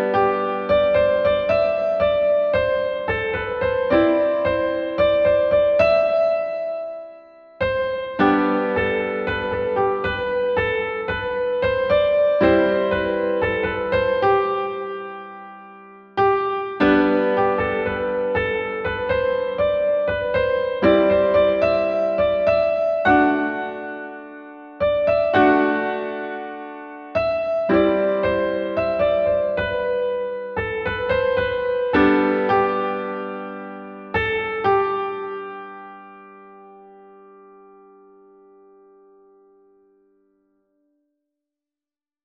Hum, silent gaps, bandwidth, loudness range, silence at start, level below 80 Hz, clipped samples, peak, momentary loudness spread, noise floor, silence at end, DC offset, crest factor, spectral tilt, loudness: none; none; 6 kHz; 4 LU; 0 s; -46 dBFS; under 0.1%; -4 dBFS; 13 LU; under -90 dBFS; 5.4 s; under 0.1%; 18 dB; -8 dB/octave; -20 LUFS